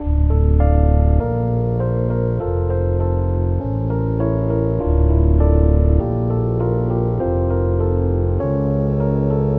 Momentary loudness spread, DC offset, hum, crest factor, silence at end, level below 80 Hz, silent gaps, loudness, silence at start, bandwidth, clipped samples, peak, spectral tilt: 5 LU; under 0.1%; none; 12 dB; 0 s; -20 dBFS; none; -18 LUFS; 0 s; 2.5 kHz; under 0.1%; -4 dBFS; -13.5 dB/octave